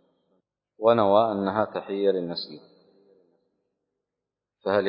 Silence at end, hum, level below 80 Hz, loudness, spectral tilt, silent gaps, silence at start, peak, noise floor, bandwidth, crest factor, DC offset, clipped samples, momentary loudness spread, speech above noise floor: 0 s; 50 Hz at -70 dBFS; -66 dBFS; -24 LUFS; -10 dB/octave; none; 0.8 s; -6 dBFS; -87 dBFS; 5.4 kHz; 20 dB; under 0.1%; under 0.1%; 14 LU; 63 dB